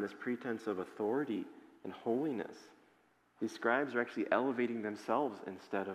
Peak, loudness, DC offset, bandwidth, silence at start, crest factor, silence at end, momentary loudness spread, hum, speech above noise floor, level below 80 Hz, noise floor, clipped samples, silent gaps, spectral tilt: -16 dBFS; -37 LUFS; under 0.1%; 14.5 kHz; 0 s; 22 dB; 0 s; 14 LU; none; 34 dB; -88 dBFS; -71 dBFS; under 0.1%; none; -6 dB/octave